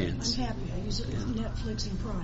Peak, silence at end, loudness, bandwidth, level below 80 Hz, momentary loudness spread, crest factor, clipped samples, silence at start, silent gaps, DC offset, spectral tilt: -16 dBFS; 0 s; -33 LUFS; 8 kHz; -36 dBFS; 4 LU; 14 dB; under 0.1%; 0 s; none; under 0.1%; -5.5 dB/octave